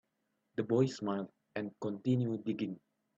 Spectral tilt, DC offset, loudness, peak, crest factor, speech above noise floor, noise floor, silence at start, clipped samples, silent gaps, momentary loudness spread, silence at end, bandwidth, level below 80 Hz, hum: -7.5 dB/octave; under 0.1%; -36 LUFS; -18 dBFS; 18 dB; 48 dB; -82 dBFS; 0.55 s; under 0.1%; none; 11 LU; 0.4 s; 7.8 kHz; -76 dBFS; none